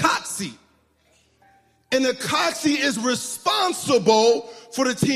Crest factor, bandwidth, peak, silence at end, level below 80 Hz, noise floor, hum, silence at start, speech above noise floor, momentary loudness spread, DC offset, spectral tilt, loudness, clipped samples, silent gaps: 20 dB; 15.5 kHz; -2 dBFS; 0 s; -62 dBFS; -61 dBFS; none; 0 s; 41 dB; 9 LU; under 0.1%; -3 dB/octave; -21 LUFS; under 0.1%; none